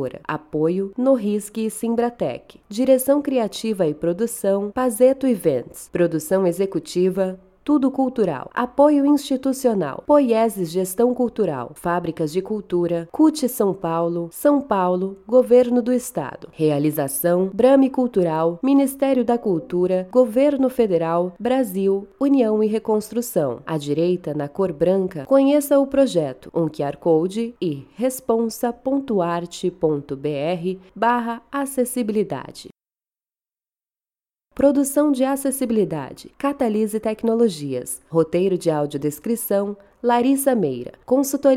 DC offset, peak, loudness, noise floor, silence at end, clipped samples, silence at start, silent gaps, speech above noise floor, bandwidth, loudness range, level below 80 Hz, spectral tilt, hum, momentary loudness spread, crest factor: under 0.1%; -4 dBFS; -20 LUFS; under -90 dBFS; 0 s; under 0.1%; 0 s; none; over 70 dB; 16.5 kHz; 4 LU; -56 dBFS; -6 dB/octave; none; 9 LU; 16 dB